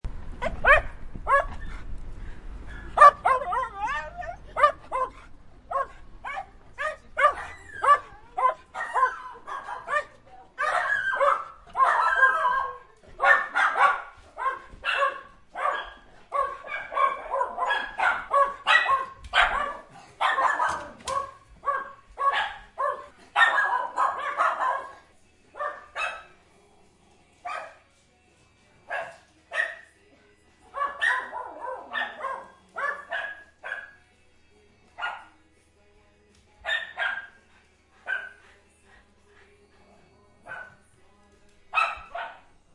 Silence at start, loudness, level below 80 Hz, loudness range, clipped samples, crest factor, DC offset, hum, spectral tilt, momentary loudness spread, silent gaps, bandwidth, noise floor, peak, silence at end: 0.05 s; -25 LUFS; -46 dBFS; 14 LU; under 0.1%; 26 dB; under 0.1%; none; -2.5 dB/octave; 21 LU; none; 11.5 kHz; -61 dBFS; -2 dBFS; 0.4 s